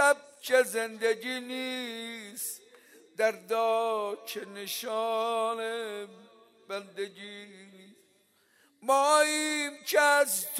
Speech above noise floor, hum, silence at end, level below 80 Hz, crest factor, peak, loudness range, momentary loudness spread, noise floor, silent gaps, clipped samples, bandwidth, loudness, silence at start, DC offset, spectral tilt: 38 dB; none; 0 s; under -90 dBFS; 20 dB; -10 dBFS; 8 LU; 17 LU; -67 dBFS; none; under 0.1%; 16 kHz; -29 LUFS; 0 s; under 0.1%; -1 dB/octave